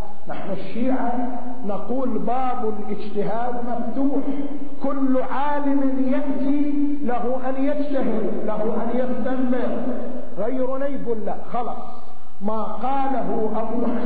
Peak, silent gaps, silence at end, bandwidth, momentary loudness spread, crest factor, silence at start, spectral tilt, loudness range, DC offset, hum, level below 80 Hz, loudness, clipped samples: -6 dBFS; none; 0 s; 4.9 kHz; 8 LU; 14 dB; 0 s; -10.5 dB/octave; 3 LU; 20%; none; -54 dBFS; -25 LUFS; under 0.1%